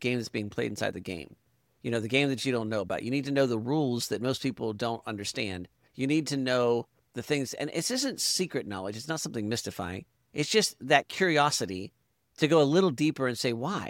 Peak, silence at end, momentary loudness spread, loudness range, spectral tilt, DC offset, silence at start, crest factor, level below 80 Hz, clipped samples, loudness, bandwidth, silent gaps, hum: -8 dBFS; 0 s; 14 LU; 5 LU; -4 dB/octave; under 0.1%; 0 s; 22 dB; -66 dBFS; under 0.1%; -29 LUFS; 17 kHz; none; none